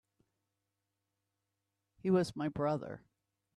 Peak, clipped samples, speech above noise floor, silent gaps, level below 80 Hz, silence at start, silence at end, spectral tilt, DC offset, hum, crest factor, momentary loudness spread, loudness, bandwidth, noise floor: -20 dBFS; under 0.1%; 53 dB; none; -70 dBFS; 2.05 s; 0.6 s; -7.5 dB/octave; under 0.1%; none; 20 dB; 15 LU; -35 LUFS; 12 kHz; -87 dBFS